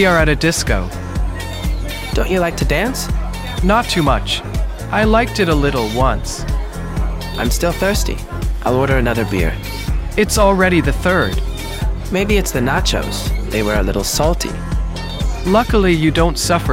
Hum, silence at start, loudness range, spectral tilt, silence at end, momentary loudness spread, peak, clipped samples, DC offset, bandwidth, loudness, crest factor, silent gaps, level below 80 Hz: none; 0 s; 3 LU; -5 dB/octave; 0 s; 10 LU; 0 dBFS; under 0.1%; under 0.1%; 16.5 kHz; -17 LUFS; 16 dB; none; -22 dBFS